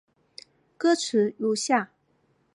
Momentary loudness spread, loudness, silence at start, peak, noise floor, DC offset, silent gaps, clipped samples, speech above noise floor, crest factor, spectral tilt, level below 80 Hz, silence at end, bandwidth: 4 LU; -25 LUFS; 0.8 s; -8 dBFS; -68 dBFS; under 0.1%; none; under 0.1%; 44 dB; 20 dB; -3.5 dB/octave; -80 dBFS; 0.7 s; 11.5 kHz